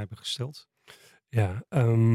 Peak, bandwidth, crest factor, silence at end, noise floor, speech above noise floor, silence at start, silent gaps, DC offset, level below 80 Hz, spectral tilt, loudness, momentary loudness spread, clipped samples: -10 dBFS; 12 kHz; 16 dB; 0 s; -55 dBFS; 30 dB; 0 s; none; under 0.1%; -66 dBFS; -7 dB/octave; -28 LUFS; 13 LU; under 0.1%